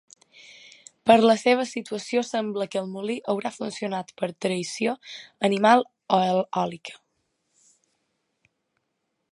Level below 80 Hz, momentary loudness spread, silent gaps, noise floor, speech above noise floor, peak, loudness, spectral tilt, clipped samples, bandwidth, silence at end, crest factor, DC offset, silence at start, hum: -74 dBFS; 13 LU; none; -78 dBFS; 54 dB; -2 dBFS; -24 LUFS; -5 dB/octave; under 0.1%; 11.5 kHz; 2.35 s; 24 dB; under 0.1%; 1.05 s; none